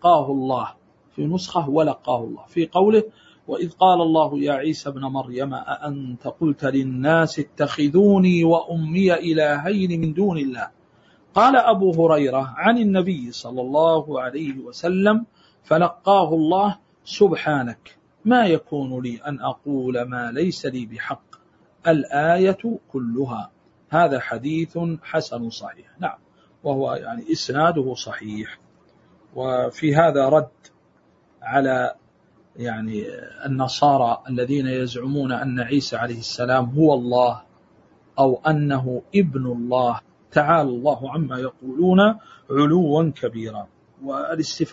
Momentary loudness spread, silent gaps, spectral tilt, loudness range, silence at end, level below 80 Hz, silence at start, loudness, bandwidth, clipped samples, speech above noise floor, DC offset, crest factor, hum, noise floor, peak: 13 LU; none; -7 dB/octave; 6 LU; 0 s; -60 dBFS; 0 s; -21 LUFS; 8 kHz; under 0.1%; 38 dB; under 0.1%; 20 dB; none; -59 dBFS; -2 dBFS